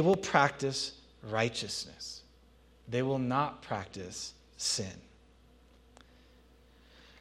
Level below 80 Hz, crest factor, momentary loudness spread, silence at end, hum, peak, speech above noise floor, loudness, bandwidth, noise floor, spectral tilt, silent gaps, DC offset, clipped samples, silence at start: -62 dBFS; 28 dB; 16 LU; 2.2 s; none; -8 dBFS; 29 dB; -33 LUFS; 14 kHz; -61 dBFS; -4 dB/octave; none; under 0.1%; under 0.1%; 0 s